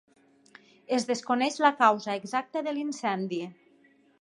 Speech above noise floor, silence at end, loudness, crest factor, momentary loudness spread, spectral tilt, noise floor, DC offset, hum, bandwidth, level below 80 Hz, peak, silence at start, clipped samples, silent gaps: 35 dB; 0.7 s; -28 LUFS; 22 dB; 10 LU; -4 dB/octave; -62 dBFS; under 0.1%; none; 11.5 kHz; -84 dBFS; -8 dBFS; 0.9 s; under 0.1%; none